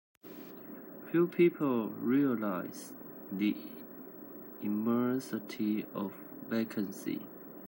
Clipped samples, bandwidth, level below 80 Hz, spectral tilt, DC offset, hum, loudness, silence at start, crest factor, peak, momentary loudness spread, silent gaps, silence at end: under 0.1%; 16 kHz; -84 dBFS; -7 dB/octave; under 0.1%; none; -33 LUFS; 0.25 s; 18 dB; -16 dBFS; 18 LU; none; 0 s